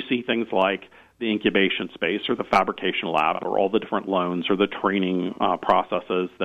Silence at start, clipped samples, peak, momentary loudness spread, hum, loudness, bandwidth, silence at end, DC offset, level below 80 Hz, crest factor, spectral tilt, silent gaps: 0 s; under 0.1%; -6 dBFS; 5 LU; none; -23 LUFS; 10.5 kHz; 0 s; under 0.1%; -60 dBFS; 18 dB; -6.5 dB/octave; none